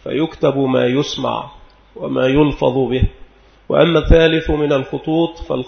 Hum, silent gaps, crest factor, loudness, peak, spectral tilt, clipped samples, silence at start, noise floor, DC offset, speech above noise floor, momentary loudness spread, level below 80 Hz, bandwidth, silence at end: none; none; 16 dB; -16 LUFS; 0 dBFS; -7 dB/octave; under 0.1%; 0.05 s; -42 dBFS; under 0.1%; 27 dB; 10 LU; -26 dBFS; 6.6 kHz; 0 s